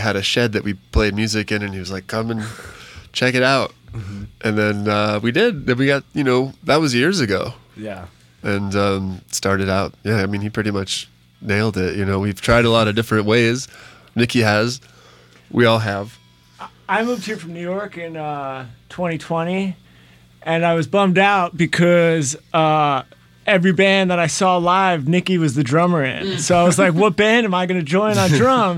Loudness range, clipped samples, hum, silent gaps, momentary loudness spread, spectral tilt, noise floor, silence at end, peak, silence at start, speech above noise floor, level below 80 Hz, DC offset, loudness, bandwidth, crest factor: 6 LU; under 0.1%; none; none; 15 LU; -5 dB/octave; -48 dBFS; 0 s; -4 dBFS; 0 s; 31 dB; -40 dBFS; under 0.1%; -18 LUFS; 16 kHz; 14 dB